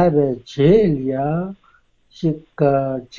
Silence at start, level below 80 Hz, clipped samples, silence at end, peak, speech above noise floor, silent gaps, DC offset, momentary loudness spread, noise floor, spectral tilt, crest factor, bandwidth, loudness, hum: 0 s; -44 dBFS; under 0.1%; 0 s; -2 dBFS; 39 dB; none; under 0.1%; 10 LU; -56 dBFS; -9 dB/octave; 16 dB; 7.2 kHz; -18 LUFS; none